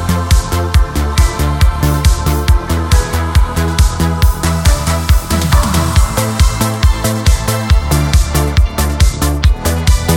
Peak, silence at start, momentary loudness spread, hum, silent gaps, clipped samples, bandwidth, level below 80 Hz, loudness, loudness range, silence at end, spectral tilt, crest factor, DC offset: 0 dBFS; 0 s; 2 LU; none; none; under 0.1%; 18 kHz; -14 dBFS; -13 LUFS; 0 LU; 0 s; -5 dB/octave; 12 dB; under 0.1%